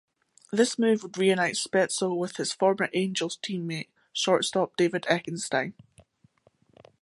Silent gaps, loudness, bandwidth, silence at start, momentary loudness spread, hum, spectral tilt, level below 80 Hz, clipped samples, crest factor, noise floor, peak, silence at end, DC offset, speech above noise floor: none; -27 LUFS; 11.5 kHz; 0.5 s; 8 LU; none; -4 dB/octave; -74 dBFS; under 0.1%; 20 dB; -65 dBFS; -8 dBFS; 1.3 s; under 0.1%; 39 dB